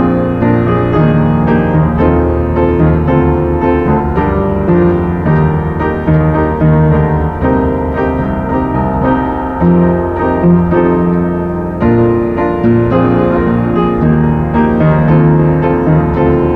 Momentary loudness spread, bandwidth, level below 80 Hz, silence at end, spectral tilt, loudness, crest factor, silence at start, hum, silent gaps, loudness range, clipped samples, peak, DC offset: 4 LU; 4.3 kHz; -22 dBFS; 0 s; -11 dB/octave; -11 LUFS; 10 dB; 0 s; none; none; 2 LU; under 0.1%; 0 dBFS; 0.8%